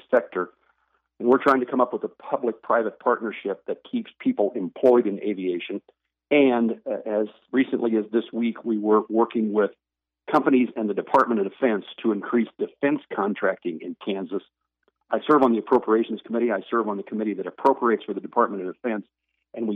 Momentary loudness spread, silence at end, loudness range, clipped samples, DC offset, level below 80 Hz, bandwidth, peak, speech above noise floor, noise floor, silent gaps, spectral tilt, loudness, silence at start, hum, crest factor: 11 LU; 0 s; 3 LU; under 0.1%; under 0.1%; -74 dBFS; 6.8 kHz; -6 dBFS; 48 dB; -72 dBFS; none; -8 dB/octave; -24 LUFS; 0.1 s; none; 18 dB